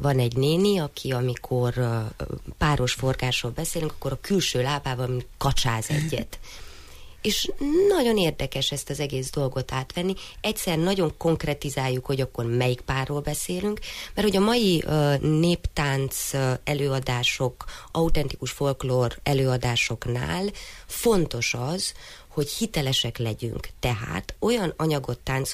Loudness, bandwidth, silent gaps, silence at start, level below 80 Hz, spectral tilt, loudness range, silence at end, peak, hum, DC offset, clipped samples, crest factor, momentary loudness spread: -25 LUFS; 15.5 kHz; none; 0 s; -40 dBFS; -5 dB/octave; 3 LU; 0 s; -10 dBFS; none; under 0.1%; under 0.1%; 14 dB; 8 LU